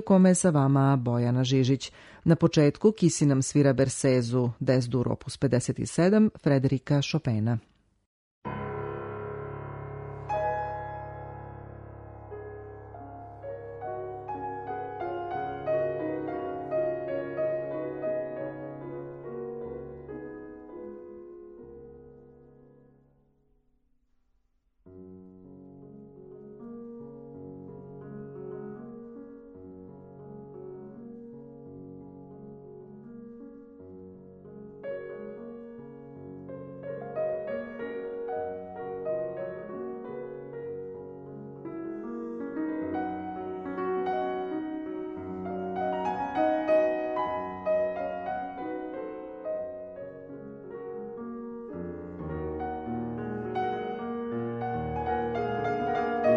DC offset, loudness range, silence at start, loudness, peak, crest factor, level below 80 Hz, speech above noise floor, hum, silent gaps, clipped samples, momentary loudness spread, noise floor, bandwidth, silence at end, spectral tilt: under 0.1%; 21 LU; 0 s; -30 LUFS; -8 dBFS; 22 dB; -58 dBFS; 46 dB; none; 8.06-8.42 s; under 0.1%; 23 LU; -70 dBFS; 10.5 kHz; 0 s; -6.5 dB/octave